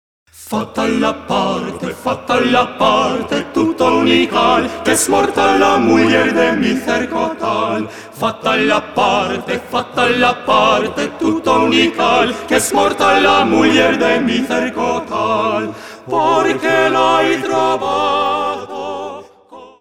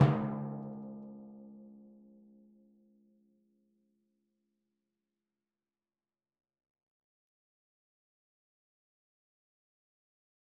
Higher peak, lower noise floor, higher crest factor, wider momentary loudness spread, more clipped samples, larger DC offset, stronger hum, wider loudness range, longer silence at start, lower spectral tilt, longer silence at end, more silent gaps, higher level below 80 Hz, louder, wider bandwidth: first, 0 dBFS vs -12 dBFS; second, -39 dBFS vs under -90 dBFS; second, 14 dB vs 30 dB; second, 10 LU vs 24 LU; neither; first, 0.4% vs under 0.1%; neither; second, 3 LU vs 23 LU; first, 0.35 s vs 0 s; second, -3.5 dB/octave vs -8 dB/octave; second, 0.1 s vs 8.65 s; neither; first, -50 dBFS vs -74 dBFS; first, -14 LUFS vs -37 LUFS; first, 17.5 kHz vs 3.3 kHz